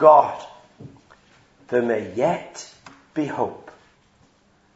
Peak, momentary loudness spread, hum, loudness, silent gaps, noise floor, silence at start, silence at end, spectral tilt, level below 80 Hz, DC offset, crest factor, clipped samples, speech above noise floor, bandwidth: 0 dBFS; 26 LU; none; -22 LUFS; none; -59 dBFS; 0 s; 1.05 s; -6 dB/octave; -68 dBFS; under 0.1%; 22 dB; under 0.1%; 40 dB; 8 kHz